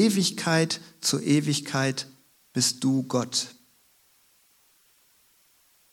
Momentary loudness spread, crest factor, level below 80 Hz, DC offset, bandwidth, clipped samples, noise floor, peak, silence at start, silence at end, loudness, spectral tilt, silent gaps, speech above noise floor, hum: 10 LU; 20 dB; -74 dBFS; under 0.1%; 19 kHz; under 0.1%; -63 dBFS; -8 dBFS; 0 s; 2.4 s; -25 LUFS; -4 dB/octave; none; 38 dB; none